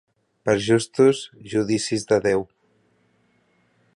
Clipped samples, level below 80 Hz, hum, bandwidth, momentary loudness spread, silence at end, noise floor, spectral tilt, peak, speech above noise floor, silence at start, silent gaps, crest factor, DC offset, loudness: under 0.1%; -58 dBFS; none; 11.5 kHz; 10 LU; 1.5 s; -64 dBFS; -5 dB/octave; -6 dBFS; 43 dB; 0.45 s; none; 18 dB; under 0.1%; -21 LUFS